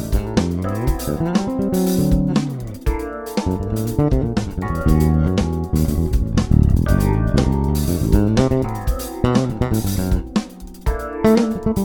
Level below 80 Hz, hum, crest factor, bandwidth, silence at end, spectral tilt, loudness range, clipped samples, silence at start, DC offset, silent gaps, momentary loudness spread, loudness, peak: -24 dBFS; none; 18 dB; 19.5 kHz; 0 s; -7 dB/octave; 3 LU; under 0.1%; 0 s; under 0.1%; none; 8 LU; -19 LUFS; 0 dBFS